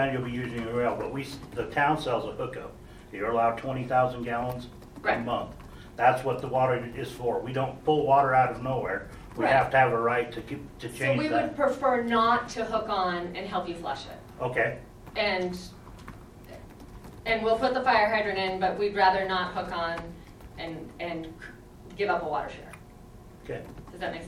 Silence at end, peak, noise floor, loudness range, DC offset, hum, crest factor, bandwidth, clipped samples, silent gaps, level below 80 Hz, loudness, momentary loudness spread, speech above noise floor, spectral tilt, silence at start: 0 s; -8 dBFS; -48 dBFS; 8 LU; under 0.1%; none; 20 dB; 15.5 kHz; under 0.1%; none; -52 dBFS; -28 LUFS; 21 LU; 21 dB; -6 dB/octave; 0 s